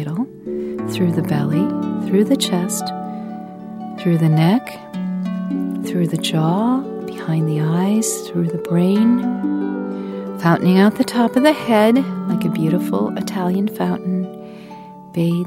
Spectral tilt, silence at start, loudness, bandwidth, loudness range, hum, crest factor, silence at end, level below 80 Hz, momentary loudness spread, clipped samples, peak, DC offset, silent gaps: -6 dB/octave; 0 s; -18 LUFS; 16 kHz; 4 LU; none; 18 dB; 0 s; -60 dBFS; 13 LU; under 0.1%; 0 dBFS; under 0.1%; none